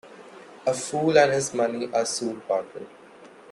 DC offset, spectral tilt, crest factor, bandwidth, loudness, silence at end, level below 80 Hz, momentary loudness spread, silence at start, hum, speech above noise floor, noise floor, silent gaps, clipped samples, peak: under 0.1%; -4 dB/octave; 20 dB; 12.5 kHz; -24 LUFS; 0.25 s; -70 dBFS; 23 LU; 0.05 s; none; 24 dB; -48 dBFS; none; under 0.1%; -6 dBFS